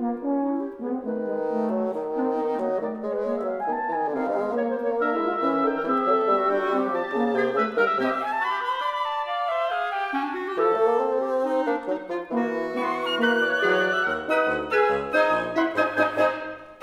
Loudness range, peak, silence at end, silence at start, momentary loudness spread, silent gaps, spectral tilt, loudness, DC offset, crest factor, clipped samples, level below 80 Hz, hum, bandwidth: 4 LU; -8 dBFS; 0.05 s; 0 s; 6 LU; none; -5.5 dB/octave; -24 LUFS; under 0.1%; 16 dB; under 0.1%; -62 dBFS; none; 13 kHz